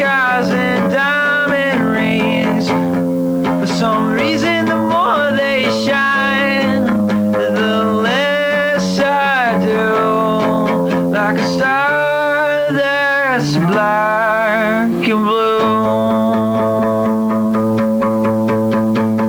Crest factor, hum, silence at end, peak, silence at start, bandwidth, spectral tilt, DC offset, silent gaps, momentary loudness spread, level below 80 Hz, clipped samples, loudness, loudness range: 10 dB; none; 0 s; -4 dBFS; 0 s; over 20 kHz; -6 dB/octave; under 0.1%; none; 2 LU; -50 dBFS; under 0.1%; -14 LUFS; 1 LU